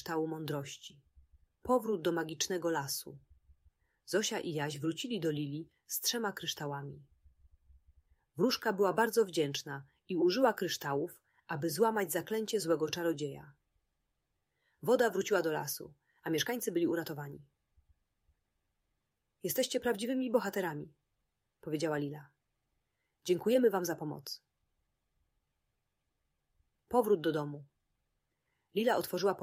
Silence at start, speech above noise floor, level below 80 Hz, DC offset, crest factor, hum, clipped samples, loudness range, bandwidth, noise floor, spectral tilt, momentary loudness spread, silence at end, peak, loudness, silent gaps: 0 s; 50 dB; -72 dBFS; under 0.1%; 20 dB; none; under 0.1%; 6 LU; 16 kHz; -84 dBFS; -4 dB/octave; 15 LU; 0 s; -14 dBFS; -34 LUFS; none